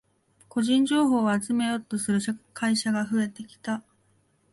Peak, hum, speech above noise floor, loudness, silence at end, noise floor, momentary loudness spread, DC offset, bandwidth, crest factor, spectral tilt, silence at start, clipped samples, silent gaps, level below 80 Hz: -12 dBFS; none; 41 dB; -26 LUFS; 0.7 s; -66 dBFS; 11 LU; under 0.1%; 11.5 kHz; 14 dB; -4.5 dB/octave; 0.55 s; under 0.1%; none; -68 dBFS